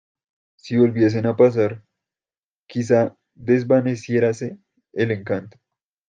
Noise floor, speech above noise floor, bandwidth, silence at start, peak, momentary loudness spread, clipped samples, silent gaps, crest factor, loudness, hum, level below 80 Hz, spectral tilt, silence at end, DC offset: under -90 dBFS; over 71 dB; 9 kHz; 0.65 s; -4 dBFS; 14 LU; under 0.1%; 2.38-2.66 s; 18 dB; -20 LUFS; none; -64 dBFS; -7.5 dB/octave; 0.6 s; under 0.1%